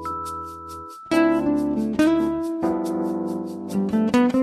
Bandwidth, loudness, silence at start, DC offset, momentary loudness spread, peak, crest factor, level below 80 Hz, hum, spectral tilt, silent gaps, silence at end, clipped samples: 13 kHz; -23 LUFS; 0 s; under 0.1%; 14 LU; -8 dBFS; 16 dB; -50 dBFS; none; -6.5 dB/octave; none; 0 s; under 0.1%